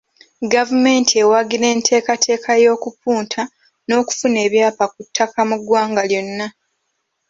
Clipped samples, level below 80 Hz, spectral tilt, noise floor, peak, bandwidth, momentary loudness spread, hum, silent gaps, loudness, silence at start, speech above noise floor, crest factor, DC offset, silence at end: under 0.1%; -64 dBFS; -2.5 dB/octave; -71 dBFS; 0 dBFS; 7.8 kHz; 11 LU; none; none; -16 LUFS; 0.4 s; 55 dB; 16 dB; under 0.1%; 0.8 s